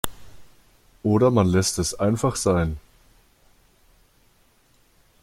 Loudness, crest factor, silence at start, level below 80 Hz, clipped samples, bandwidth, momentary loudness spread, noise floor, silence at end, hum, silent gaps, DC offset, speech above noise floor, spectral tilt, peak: -22 LUFS; 22 dB; 0.05 s; -46 dBFS; under 0.1%; 16.5 kHz; 11 LU; -60 dBFS; 2.45 s; none; none; under 0.1%; 39 dB; -5.5 dB/octave; -2 dBFS